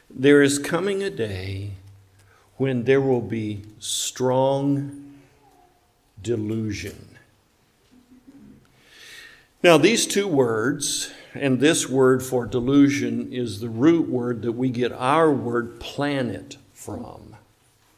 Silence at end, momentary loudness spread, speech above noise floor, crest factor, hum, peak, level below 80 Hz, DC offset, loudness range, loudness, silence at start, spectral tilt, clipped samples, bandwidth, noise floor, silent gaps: 0.6 s; 19 LU; 40 dB; 20 dB; none; -2 dBFS; -54 dBFS; under 0.1%; 13 LU; -22 LUFS; 0.1 s; -4.5 dB/octave; under 0.1%; 16 kHz; -62 dBFS; none